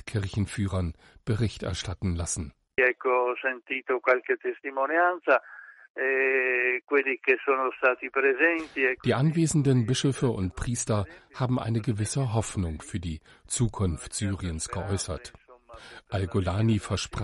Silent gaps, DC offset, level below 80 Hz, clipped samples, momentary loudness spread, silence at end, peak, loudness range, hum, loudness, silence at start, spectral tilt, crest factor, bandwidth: 5.90-5.95 s; under 0.1%; -48 dBFS; under 0.1%; 11 LU; 0 s; -10 dBFS; 6 LU; none; -27 LUFS; 0.05 s; -5 dB/octave; 18 dB; 11.5 kHz